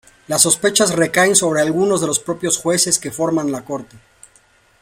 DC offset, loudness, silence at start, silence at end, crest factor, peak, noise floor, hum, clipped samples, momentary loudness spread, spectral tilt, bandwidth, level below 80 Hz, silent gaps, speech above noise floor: under 0.1%; -16 LUFS; 0.3 s; 0.85 s; 18 dB; 0 dBFS; -54 dBFS; none; under 0.1%; 9 LU; -2.5 dB/octave; 16.5 kHz; -56 dBFS; none; 37 dB